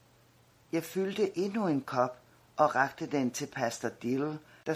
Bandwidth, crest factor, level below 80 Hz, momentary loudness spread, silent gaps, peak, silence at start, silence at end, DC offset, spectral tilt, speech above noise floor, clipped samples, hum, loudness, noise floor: 16 kHz; 22 dB; -74 dBFS; 8 LU; none; -10 dBFS; 0.75 s; 0 s; under 0.1%; -5 dB/octave; 32 dB; under 0.1%; none; -32 LUFS; -63 dBFS